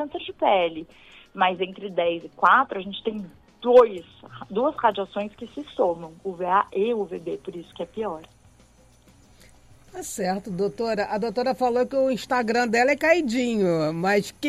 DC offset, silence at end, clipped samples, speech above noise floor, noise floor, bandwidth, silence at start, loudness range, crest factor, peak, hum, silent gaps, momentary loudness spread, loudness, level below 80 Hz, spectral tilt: under 0.1%; 0 s; under 0.1%; 31 dB; -55 dBFS; 14.5 kHz; 0 s; 10 LU; 20 dB; -4 dBFS; none; none; 17 LU; -23 LUFS; -60 dBFS; -5 dB/octave